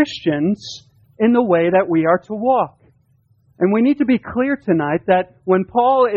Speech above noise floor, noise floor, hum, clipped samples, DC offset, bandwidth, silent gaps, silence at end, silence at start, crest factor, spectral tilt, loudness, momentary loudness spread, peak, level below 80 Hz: 42 dB; -58 dBFS; none; under 0.1%; under 0.1%; 7.4 kHz; none; 0 s; 0 s; 14 dB; -7.5 dB/octave; -17 LUFS; 6 LU; -2 dBFS; -56 dBFS